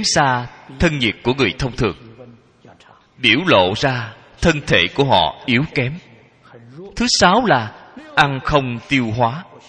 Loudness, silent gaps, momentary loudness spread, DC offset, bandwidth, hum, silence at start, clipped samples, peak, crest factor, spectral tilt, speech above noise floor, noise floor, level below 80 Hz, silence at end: -17 LUFS; none; 11 LU; under 0.1%; 9.8 kHz; none; 0 s; under 0.1%; 0 dBFS; 18 dB; -4 dB/octave; 31 dB; -48 dBFS; -38 dBFS; 0.25 s